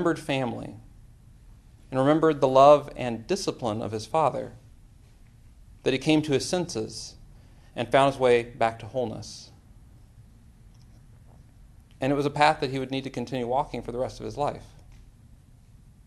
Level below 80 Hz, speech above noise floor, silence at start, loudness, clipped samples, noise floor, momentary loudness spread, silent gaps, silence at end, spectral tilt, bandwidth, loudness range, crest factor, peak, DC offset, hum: -52 dBFS; 28 dB; 0 s; -25 LUFS; under 0.1%; -53 dBFS; 15 LU; none; 1.15 s; -5.5 dB/octave; 12.5 kHz; 9 LU; 22 dB; -4 dBFS; under 0.1%; none